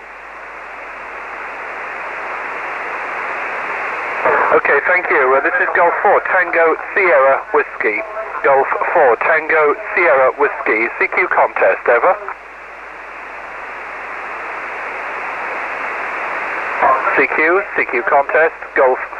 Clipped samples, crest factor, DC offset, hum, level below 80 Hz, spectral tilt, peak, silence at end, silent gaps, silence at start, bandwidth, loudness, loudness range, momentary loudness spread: under 0.1%; 14 dB; under 0.1%; none; -54 dBFS; -5 dB/octave; -2 dBFS; 0 s; none; 0 s; 8.6 kHz; -15 LUFS; 11 LU; 16 LU